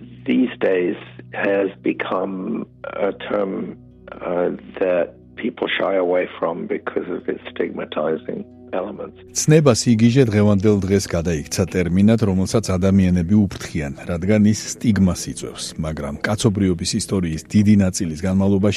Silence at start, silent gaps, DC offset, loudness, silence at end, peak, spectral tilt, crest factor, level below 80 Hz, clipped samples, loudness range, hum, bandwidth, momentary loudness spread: 0 s; none; under 0.1%; -20 LUFS; 0 s; 0 dBFS; -6 dB/octave; 18 dB; -44 dBFS; under 0.1%; 7 LU; none; 13.5 kHz; 12 LU